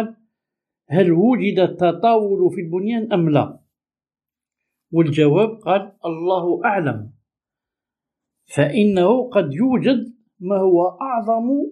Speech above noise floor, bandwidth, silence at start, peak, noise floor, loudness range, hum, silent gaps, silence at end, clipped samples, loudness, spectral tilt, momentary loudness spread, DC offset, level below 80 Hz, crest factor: over 73 dB; 11 kHz; 0 s; -2 dBFS; under -90 dBFS; 3 LU; none; none; 0 s; under 0.1%; -18 LUFS; -8 dB/octave; 9 LU; under 0.1%; -64 dBFS; 18 dB